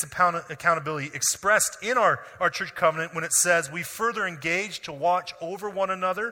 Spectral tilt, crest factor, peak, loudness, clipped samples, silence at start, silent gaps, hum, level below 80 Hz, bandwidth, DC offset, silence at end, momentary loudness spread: -2 dB/octave; 18 dB; -8 dBFS; -25 LUFS; under 0.1%; 0 s; none; none; -64 dBFS; 17 kHz; under 0.1%; 0 s; 9 LU